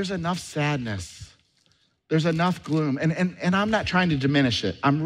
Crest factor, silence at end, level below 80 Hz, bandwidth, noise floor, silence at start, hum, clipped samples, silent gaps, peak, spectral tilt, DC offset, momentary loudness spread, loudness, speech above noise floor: 16 dB; 0 s; -52 dBFS; 12.5 kHz; -65 dBFS; 0 s; none; under 0.1%; none; -8 dBFS; -6 dB/octave; under 0.1%; 7 LU; -24 LUFS; 42 dB